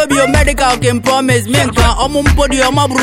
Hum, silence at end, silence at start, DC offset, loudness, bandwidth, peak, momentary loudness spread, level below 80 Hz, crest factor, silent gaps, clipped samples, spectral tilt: none; 0 s; 0 s; under 0.1%; -11 LUFS; 16.5 kHz; 0 dBFS; 2 LU; -20 dBFS; 10 dB; none; under 0.1%; -4.5 dB/octave